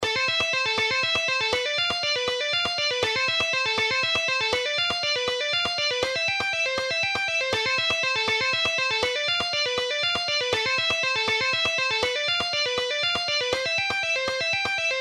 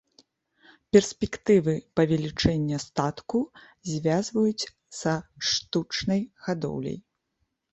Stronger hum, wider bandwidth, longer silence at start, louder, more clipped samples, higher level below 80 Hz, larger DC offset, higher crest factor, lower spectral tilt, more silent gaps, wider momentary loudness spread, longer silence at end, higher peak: neither; first, 15 kHz vs 8.4 kHz; second, 0 s vs 0.95 s; first, -23 LUFS vs -26 LUFS; neither; second, -58 dBFS vs -50 dBFS; neither; second, 14 dB vs 22 dB; second, -1 dB/octave vs -5 dB/octave; neither; second, 2 LU vs 12 LU; second, 0 s vs 0.75 s; second, -10 dBFS vs -4 dBFS